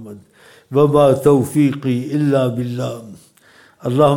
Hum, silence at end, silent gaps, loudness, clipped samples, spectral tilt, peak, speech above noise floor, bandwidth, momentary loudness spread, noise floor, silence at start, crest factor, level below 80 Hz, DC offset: none; 0 s; none; -16 LUFS; under 0.1%; -7.5 dB/octave; -2 dBFS; 34 dB; 17 kHz; 14 LU; -49 dBFS; 0 s; 14 dB; -54 dBFS; under 0.1%